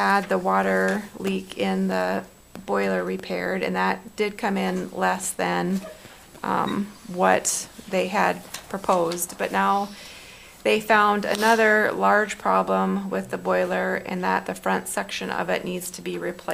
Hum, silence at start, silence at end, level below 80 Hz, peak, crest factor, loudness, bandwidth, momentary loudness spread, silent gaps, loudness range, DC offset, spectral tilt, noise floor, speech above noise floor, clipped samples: none; 0 s; 0 s; -58 dBFS; -4 dBFS; 20 dB; -24 LUFS; 16 kHz; 11 LU; none; 5 LU; under 0.1%; -4 dB/octave; -45 dBFS; 21 dB; under 0.1%